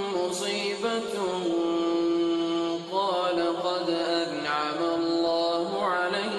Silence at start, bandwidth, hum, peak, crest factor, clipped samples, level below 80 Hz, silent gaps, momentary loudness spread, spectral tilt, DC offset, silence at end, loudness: 0 s; 12 kHz; none; -14 dBFS; 14 dB; under 0.1%; -68 dBFS; none; 3 LU; -4 dB/octave; under 0.1%; 0 s; -27 LUFS